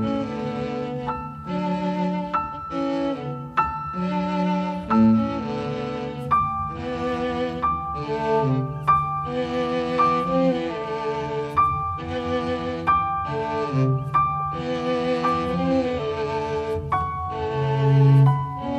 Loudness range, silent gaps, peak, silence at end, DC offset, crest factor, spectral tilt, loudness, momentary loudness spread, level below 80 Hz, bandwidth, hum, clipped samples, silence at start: 3 LU; none; -8 dBFS; 0 s; under 0.1%; 16 dB; -8 dB/octave; -23 LUFS; 8 LU; -46 dBFS; 8.2 kHz; none; under 0.1%; 0 s